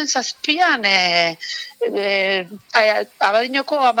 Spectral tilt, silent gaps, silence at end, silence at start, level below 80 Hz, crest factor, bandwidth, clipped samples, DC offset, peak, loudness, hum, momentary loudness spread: -1.5 dB/octave; none; 0 s; 0 s; -76 dBFS; 18 dB; 18 kHz; under 0.1%; under 0.1%; 0 dBFS; -17 LUFS; none; 9 LU